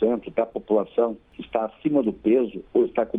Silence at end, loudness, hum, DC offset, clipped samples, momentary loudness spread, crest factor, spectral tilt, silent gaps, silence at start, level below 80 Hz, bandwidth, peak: 0 s; -24 LUFS; none; under 0.1%; under 0.1%; 6 LU; 14 dB; -9.5 dB/octave; none; 0 s; -58 dBFS; 3.8 kHz; -8 dBFS